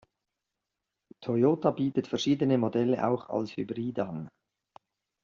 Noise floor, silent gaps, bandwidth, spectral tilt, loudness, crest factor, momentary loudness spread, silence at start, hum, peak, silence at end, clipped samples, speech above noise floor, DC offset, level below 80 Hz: -86 dBFS; none; 7.4 kHz; -6.5 dB/octave; -29 LUFS; 20 dB; 10 LU; 1.2 s; none; -10 dBFS; 0.95 s; under 0.1%; 58 dB; under 0.1%; -70 dBFS